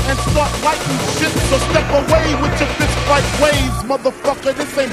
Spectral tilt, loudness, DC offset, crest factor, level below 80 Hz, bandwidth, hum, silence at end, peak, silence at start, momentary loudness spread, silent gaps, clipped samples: -4.5 dB/octave; -16 LUFS; under 0.1%; 16 dB; -26 dBFS; 15.5 kHz; none; 0 s; 0 dBFS; 0 s; 5 LU; none; under 0.1%